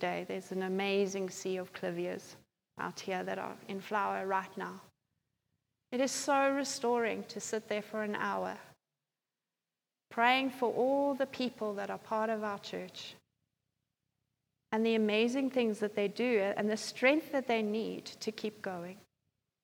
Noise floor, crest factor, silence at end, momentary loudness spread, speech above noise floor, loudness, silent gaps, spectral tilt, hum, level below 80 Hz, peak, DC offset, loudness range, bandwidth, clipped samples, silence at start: under -90 dBFS; 22 dB; 0.65 s; 13 LU; over 56 dB; -34 LUFS; none; -4 dB/octave; none; -86 dBFS; -14 dBFS; under 0.1%; 7 LU; over 20 kHz; under 0.1%; 0 s